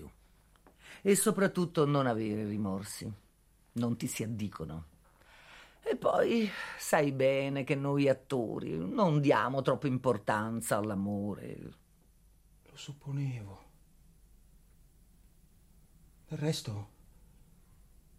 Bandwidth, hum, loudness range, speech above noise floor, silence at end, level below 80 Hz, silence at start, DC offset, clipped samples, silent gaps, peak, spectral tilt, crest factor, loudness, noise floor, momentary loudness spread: 16 kHz; none; 15 LU; 34 dB; 1.3 s; -64 dBFS; 0 s; under 0.1%; under 0.1%; none; -12 dBFS; -5.5 dB/octave; 22 dB; -32 LUFS; -66 dBFS; 17 LU